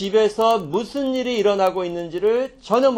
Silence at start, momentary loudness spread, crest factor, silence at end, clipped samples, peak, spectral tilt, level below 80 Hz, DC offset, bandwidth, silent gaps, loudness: 0 s; 6 LU; 16 dB; 0 s; under 0.1%; -4 dBFS; -5 dB/octave; -56 dBFS; under 0.1%; 17 kHz; none; -20 LUFS